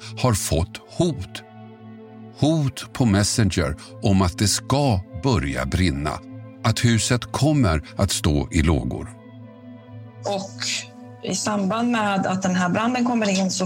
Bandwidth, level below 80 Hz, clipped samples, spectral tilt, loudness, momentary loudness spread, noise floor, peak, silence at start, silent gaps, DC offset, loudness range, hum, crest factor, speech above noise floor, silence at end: 16.5 kHz; -36 dBFS; under 0.1%; -5 dB/octave; -22 LUFS; 20 LU; -42 dBFS; -4 dBFS; 0 s; none; under 0.1%; 4 LU; none; 18 dB; 21 dB; 0 s